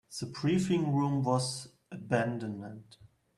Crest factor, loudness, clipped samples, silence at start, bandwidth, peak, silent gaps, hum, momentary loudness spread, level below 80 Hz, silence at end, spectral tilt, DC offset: 20 dB; -31 LUFS; under 0.1%; 0.1 s; 12.5 kHz; -12 dBFS; none; none; 18 LU; -66 dBFS; 0.3 s; -6 dB/octave; under 0.1%